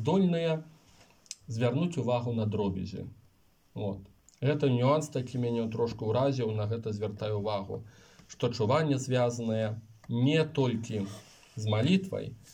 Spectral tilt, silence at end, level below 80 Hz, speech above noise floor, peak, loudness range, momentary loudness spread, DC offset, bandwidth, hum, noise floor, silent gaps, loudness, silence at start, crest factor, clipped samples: -7 dB/octave; 0 s; -66 dBFS; 36 dB; -14 dBFS; 3 LU; 14 LU; under 0.1%; 11 kHz; none; -66 dBFS; none; -31 LUFS; 0 s; 16 dB; under 0.1%